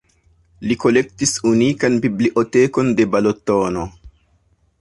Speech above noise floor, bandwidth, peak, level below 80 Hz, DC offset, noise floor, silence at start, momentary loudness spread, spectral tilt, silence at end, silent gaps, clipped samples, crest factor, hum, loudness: 43 dB; 11.5 kHz; -2 dBFS; -48 dBFS; under 0.1%; -59 dBFS; 0.6 s; 7 LU; -5 dB/octave; 0.7 s; none; under 0.1%; 16 dB; none; -17 LUFS